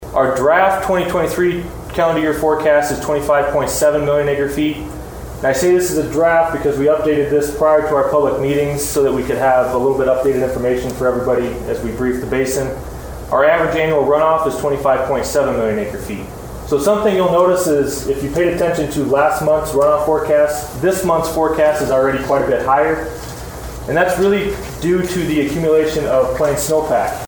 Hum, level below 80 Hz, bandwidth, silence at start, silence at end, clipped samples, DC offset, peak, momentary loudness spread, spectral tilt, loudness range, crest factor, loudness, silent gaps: none; -36 dBFS; over 20 kHz; 0 s; 0 s; under 0.1%; under 0.1%; 0 dBFS; 8 LU; -5 dB/octave; 2 LU; 14 dB; -16 LUFS; none